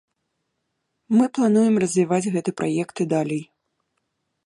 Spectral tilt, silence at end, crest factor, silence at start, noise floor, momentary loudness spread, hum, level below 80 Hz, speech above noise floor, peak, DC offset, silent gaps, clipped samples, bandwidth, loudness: -6.5 dB/octave; 1.05 s; 16 dB; 1.1 s; -76 dBFS; 7 LU; none; -70 dBFS; 56 dB; -8 dBFS; under 0.1%; none; under 0.1%; 11.5 kHz; -21 LUFS